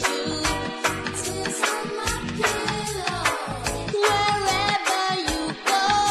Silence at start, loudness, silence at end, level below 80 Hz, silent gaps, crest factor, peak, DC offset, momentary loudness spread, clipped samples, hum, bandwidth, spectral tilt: 0 s; -24 LUFS; 0 s; -42 dBFS; none; 20 dB; -6 dBFS; under 0.1%; 7 LU; under 0.1%; none; 13.5 kHz; -2.5 dB/octave